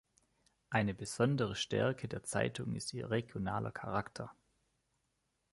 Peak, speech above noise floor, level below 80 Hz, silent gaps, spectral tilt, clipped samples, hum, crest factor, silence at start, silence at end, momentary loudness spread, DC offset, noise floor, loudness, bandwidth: -18 dBFS; 45 dB; -64 dBFS; none; -5 dB/octave; under 0.1%; none; 22 dB; 0.7 s; 1.2 s; 7 LU; under 0.1%; -82 dBFS; -37 LUFS; 11.5 kHz